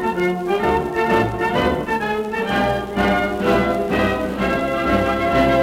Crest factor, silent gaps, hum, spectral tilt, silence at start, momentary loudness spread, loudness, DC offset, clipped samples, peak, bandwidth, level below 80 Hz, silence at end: 14 dB; none; none; -6.5 dB/octave; 0 s; 3 LU; -19 LUFS; under 0.1%; under 0.1%; -4 dBFS; 16.5 kHz; -36 dBFS; 0 s